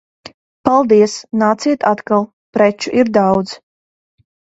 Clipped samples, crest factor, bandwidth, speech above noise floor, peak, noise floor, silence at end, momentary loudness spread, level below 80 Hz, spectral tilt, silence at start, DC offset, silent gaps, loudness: under 0.1%; 16 dB; 8 kHz; over 76 dB; 0 dBFS; under -90 dBFS; 1.05 s; 9 LU; -54 dBFS; -5.5 dB/octave; 0.65 s; under 0.1%; 2.33-2.53 s; -14 LUFS